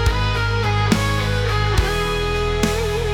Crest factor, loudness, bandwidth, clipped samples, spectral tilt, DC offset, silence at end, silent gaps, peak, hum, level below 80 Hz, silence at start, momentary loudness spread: 16 dB; -19 LUFS; 17.5 kHz; under 0.1%; -5 dB/octave; under 0.1%; 0 s; none; -4 dBFS; none; -24 dBFS; 0 s; 3 LU